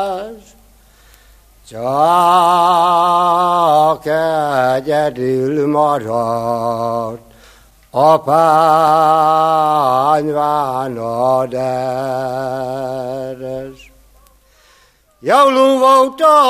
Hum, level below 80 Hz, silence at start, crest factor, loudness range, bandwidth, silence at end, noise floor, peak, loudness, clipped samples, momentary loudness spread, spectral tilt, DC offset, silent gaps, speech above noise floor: none; -52 dBFS; 0 s; 14 dB; 7 LU; 15 kHz; 0 s; -52 dBFS; 0 dBFS; -14 LUFS; under 0.1%; 13 LU; -5.5 dB/octave; under 0.1%; none; 38 dB